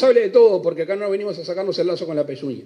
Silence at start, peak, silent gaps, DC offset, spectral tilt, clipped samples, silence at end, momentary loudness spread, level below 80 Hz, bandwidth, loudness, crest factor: 0 s; -4 dBFS; none; under 0.1%; -6.5 dB/octave; under 0.1%; 0.05 s; 11 LU; -76 dBFS; 8.6 kHz; -19 LUFS; 14 dB